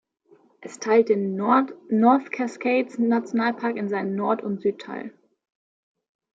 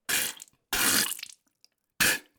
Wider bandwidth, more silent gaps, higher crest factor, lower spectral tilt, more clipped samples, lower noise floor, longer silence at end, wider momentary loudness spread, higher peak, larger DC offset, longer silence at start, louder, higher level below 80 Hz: second, 7.8 kHz vs over 20 kHz; neither; about the same, 18 dB vs 22 dB; first, -6.5 dB/octave vs 0 dB/octave; neither; second, -58 dBFS vs -68 dBFS; first, 1.25 s vs 0.2 s; second, 15 LU vs 18 LU; about the same, -6 dBFS vs -8 dBFS; neither; first, 0.6 s vs 0.1 s; first, -23 LUFS vs -26 LUFS; second, -76 dBFS vs -58 dBFS